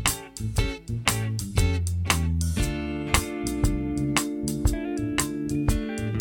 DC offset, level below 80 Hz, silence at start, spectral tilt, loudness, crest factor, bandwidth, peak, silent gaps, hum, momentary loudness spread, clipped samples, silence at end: under 0.1%; -32 dBFS; 0 s; -4.5 dB/octave; -27 LUFS; 22 dB; 17.5 kHz; -2 dBFS; none; none; 4 LU; under 0.1%; 0 s